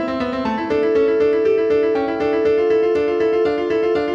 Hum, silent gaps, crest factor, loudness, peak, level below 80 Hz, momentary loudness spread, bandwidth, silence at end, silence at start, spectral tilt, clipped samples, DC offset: none; none; 10 dB; -18 LUFS; -6 dBFS; -48 dBFS; 4 LU; 6.6 kHz; 0 s; 0 s; -6.5 dB/octave; under 0.1%; under 0.1%